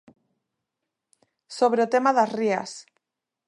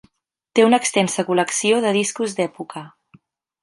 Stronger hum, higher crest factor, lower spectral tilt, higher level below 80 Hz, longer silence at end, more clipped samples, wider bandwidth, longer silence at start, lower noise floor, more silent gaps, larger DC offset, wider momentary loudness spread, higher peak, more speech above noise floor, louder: neither; about the same, 18 dB vs 18 dB; about the same, -4.5 dB/octave vs -3.5 dB/octave; second, -80 dBFS vs -70 dBFS; about the same, 0.65 s vs 0.75 s; neither; about the same, 11 kHz vs 11.5 kHz; first, 1.5 s vs 0.55 s; first, -85 dBFS vs -66 dBFS; neither; neither; first, 19 LU vs 14 LU; second, -8 dBFS vs -2 dBFS; first, 63 dB vs 48 dB; second, -23 LUFS vs -19 LUFS